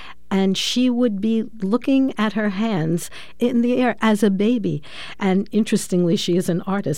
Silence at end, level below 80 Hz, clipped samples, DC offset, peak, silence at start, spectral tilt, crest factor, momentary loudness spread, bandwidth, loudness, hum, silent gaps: 0 s; -56 dBFS; under 0.1%; 2%; -6 dBFS; 0 s; -5.5 dB/octave; 14 dB; 6 LU; 16 kHz; -20 LUFS; none; none